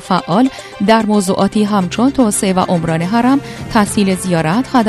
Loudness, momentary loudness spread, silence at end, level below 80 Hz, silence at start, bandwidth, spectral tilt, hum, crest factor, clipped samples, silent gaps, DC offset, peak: -14 LUFS; 3 LU; 0 s; -42 dBFS; 0 s; 13.5 kHz; -5.5 dB/octave; none; 14 dB; under 0.1%; none; under 0.1%; 0 dBFS